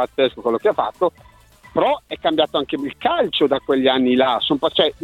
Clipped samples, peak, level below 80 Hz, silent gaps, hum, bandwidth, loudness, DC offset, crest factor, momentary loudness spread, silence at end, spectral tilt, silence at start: under 0.1%; -2 dBFS; -54 dBFS; none; none; 12.5 kHz; -19 LUFS; under 0.1%; 16 dB; 6 LU; 0.1 s; -6 dB/octave; 0 s